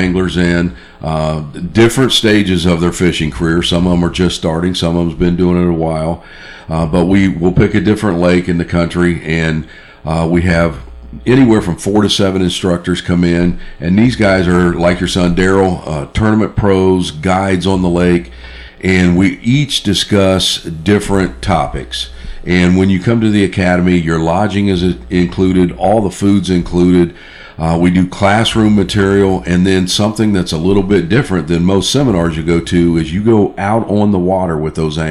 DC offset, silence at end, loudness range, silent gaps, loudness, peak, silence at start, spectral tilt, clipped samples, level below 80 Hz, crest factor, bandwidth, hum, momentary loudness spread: under 0.1%; 0 s; 2 LU; none; -12 LUFS; 0 dBFS; 0 s; -6 dB/octave; under 0.1%; -30 dBFS; 12 dB; 12.5 kHz; none; 7 LU